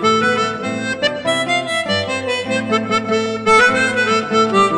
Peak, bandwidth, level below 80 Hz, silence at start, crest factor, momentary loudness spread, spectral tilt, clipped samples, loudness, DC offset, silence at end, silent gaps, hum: -2 dBFS; 10 kHz; -52 dBFS; 0 s; 14 dB; 8 LU; -3.5 dB/octave; under 0.1%; -16 LUFS; under 0.1%; 0 s; none; none